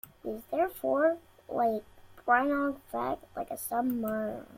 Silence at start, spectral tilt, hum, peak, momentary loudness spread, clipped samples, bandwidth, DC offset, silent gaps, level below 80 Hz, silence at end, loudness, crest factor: 0.25 s; -5.5 dB/octave; none; -12 dBFS; 12 LU; under 0.1%; 16.5 kHz; under 0.1%; none; -64 dBFS; 0 s; -31 LUFS; 20 dB